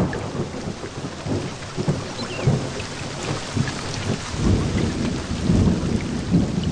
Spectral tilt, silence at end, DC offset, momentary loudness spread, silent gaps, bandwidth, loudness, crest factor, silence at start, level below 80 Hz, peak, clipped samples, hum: -6 dB/octave; 0 s; 0.1%; 9 LU; none; 10 kHz; -24 LUFS; 16 dB; 0 s; -34 dBFS; -6 dBFS; under 0.1%; none